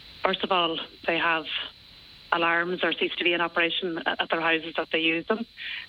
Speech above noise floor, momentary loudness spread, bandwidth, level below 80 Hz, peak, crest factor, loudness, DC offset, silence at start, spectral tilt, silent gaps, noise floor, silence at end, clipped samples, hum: 23 dB; 7 LU; 6 kHz; -64 dBFS; -6 dBFS; 22 dB; -26 LUFS; under 0.1%; 0 s; -6 dB/octave; none; -50 dBFS; 0 s; under 0.1%; none